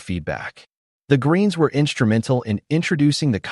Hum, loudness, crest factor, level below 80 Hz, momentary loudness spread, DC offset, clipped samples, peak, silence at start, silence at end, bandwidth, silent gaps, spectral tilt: none; -20 LUFS; 16 dB; -50 dBFS; 9 LU; under 0.1%; under 0.1%; -4 dBFS; 0 s; 0 s; 11.5 kHz; 0.77-1.00 s; -6.5 dB/octave